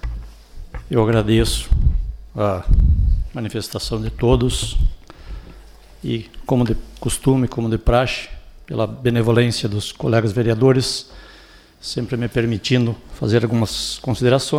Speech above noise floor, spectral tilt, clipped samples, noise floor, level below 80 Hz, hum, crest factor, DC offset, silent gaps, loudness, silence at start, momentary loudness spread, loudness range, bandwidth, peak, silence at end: 28 dB; -6 dB/octave; under 0.1%; -46 dBFS; -24 dBFS; none; 16 dB; under 0.1%; none; -20 LUFS; 0.05 s; 13 LU; 3 LU; 15.5 kHz; -4 dBFS; 0 s